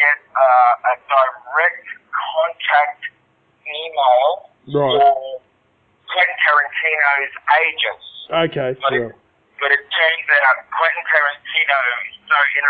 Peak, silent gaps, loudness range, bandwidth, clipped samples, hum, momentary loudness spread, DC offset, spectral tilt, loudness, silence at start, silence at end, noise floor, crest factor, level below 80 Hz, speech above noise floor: -2 dBFS; none; 3 LU; 4.9 kHz; under 0.1%; none; 12 LU; under 0.1%; -7.5 dB/octave; -16 LUFS; 0 s; 0 s; -60 dBFS; 16 dB; -66 dBFS; 43 dB